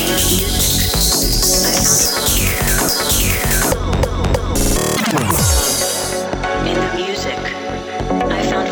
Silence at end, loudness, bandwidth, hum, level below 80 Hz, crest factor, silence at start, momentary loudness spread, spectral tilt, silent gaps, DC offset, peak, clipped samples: 0 s; -15 LUFS; over 20 kHz; none; -24 dBFS; 14 dB; 0 s; 8 LU; -3 dB/octave; none; under 0.1%; 0 dBFS; under 0.1%